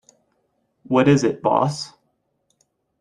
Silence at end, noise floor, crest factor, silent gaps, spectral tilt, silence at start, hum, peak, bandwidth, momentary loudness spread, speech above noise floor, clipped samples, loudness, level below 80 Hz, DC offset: 1.15 s; -70 dBFS; 20 dB; none; -6.5 dB/octave; 0.9 s; none; -4 dBFS; 11 kHz; 14 LU; 52 dB; under 0.1%; -19 LUFS; -60 dBFS; under 0.1%